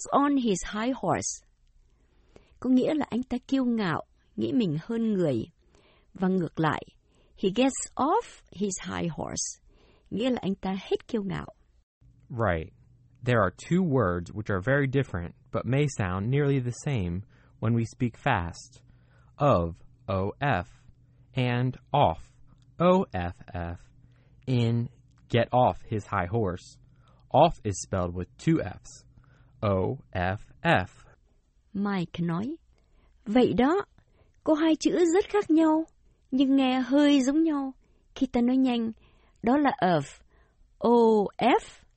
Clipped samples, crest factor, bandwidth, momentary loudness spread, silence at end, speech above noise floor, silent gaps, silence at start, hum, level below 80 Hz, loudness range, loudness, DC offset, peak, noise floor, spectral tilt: under 0.1%; 20 dB; 8.4 kHz; 14 LU; 0.25 s; 38 dB; 11.83-12.01 s; 0 s; none; -52 dBFS; 6 LU; -27 LUFS; under 0.1%; -8 dBFS; -64 dBFS; -6 dB/octave